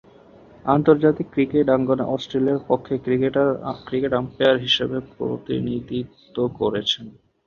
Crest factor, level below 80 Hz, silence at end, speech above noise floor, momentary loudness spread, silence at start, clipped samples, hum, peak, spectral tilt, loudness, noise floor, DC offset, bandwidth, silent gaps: 20 dB; -54 dBFS; 0.35 s; 27 dB; 11 LU; 0.65 s; under 0.1%; none; -2 dBFS; -6.5 dB/octave; -21 LUFS; -48 dBFS; under 0.1%; 7.2 kHz; none